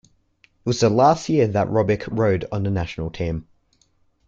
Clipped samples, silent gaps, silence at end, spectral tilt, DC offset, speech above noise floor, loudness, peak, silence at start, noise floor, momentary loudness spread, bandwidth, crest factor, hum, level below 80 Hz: under 0.1%; none; 0.85 s; -6.5 dB/octave; under 0.1%; 43 dB; -21 LUFS; -4 dBFS; 0.65 s; -62 dBFS; 11 LU; 7.8 kHz; 18 dB; none; -46 dBFS